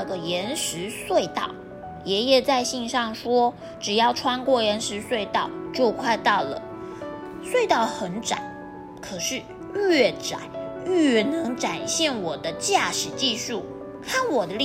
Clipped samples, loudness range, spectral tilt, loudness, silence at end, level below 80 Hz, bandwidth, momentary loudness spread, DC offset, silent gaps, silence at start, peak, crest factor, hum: under 0.1%; 3 LU; -3 dB/octave; -24 LUFS; 0 s; -58 dBFS; 16 kHz; 15 LU; under 0.1%; none; 0 s; -6 dBFS; 18 dB; none